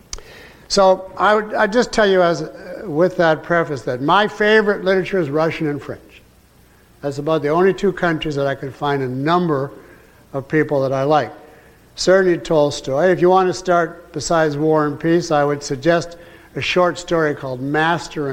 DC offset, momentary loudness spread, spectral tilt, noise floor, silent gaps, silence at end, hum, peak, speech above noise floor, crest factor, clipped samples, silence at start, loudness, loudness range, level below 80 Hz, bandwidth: under 0.1%; 12 LU; -5.5 dB/octave; -50 dBFS; none; 0 s; none; -2 dBFS; 33 dB; 16 dB; under 0.1%; 0.15 s; -17 LUFS; 4 LU; -46 dBFS; 15.5 kHz